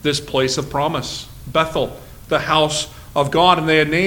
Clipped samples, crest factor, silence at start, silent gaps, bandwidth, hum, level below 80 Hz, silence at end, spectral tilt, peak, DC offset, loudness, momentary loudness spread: under 0.1%; 18 dB; 0 s; none; 19 kHz; none; -42 dBFS; 0 s; -4 dB/octave; 0 dBFS; under 0.1%; -18 LUFS; 11 LU